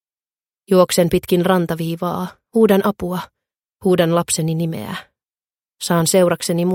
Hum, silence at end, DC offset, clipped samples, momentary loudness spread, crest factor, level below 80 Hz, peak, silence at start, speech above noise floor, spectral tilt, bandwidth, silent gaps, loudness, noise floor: none; 0 s; under 0.1%; under 0.1%; 13 LU; 18 dB; -50 dBFS; 0 dBFS; 0.7 s; over 73 dB; -5 dB/octave; 17 kHz; none; -17 LUFS; under -90 dBFS